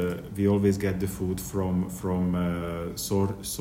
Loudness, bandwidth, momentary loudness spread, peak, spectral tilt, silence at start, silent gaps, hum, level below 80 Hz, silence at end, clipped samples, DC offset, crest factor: -28 LUFS; 16.5 kHz; 7 LU; -12 dBFS; -6.5 dB/octave; 0 s; none; none; -48 dBFS; 0 s; under 0.1%; under 0.1%; 16 dB